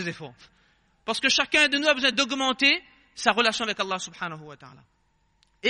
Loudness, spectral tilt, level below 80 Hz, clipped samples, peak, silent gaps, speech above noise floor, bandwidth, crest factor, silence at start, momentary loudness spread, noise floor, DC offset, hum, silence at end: -23 LUFS; -2 dB/octave; -62 dBFS; under 0.1%; -4 dBFS; none; 42 dB; 11 kHz; 22 dB; 0 s; 16 LU; -67 dBFS; under 0.1%; none; 0 s